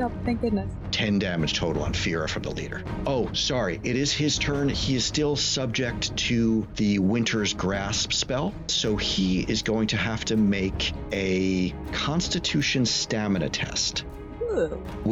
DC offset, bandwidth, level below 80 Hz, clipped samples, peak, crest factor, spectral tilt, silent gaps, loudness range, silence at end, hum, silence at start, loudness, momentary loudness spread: under 0.1%; 8.2 kHz; -40 dBFS; under 0.1%; -14 dBFS; 10 dB; -4 dB/octave; none; 2 LU; 0 s; none; 0 s; -25 LUFS; 6 LU